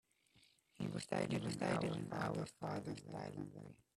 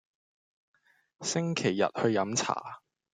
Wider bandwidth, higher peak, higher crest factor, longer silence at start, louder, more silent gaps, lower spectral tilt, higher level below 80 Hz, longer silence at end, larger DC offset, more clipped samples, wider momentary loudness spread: first, 13.5 kHz vs 9.6 kHz; second, -24 dBFS vs -12 dBFS; about the same, 20 dB vs 22 dB; second, 0.35 s vs 1.2 s; second, -43 LUFS vs -30 LUFS; neither; first, -6 dB/octave vs -4 dB/octave; about the same, -72 dBFS vs -74 dBFS; second, 0.2 s vs 0.35 s; neither; neither; about the same, 9 LU vs 11 LU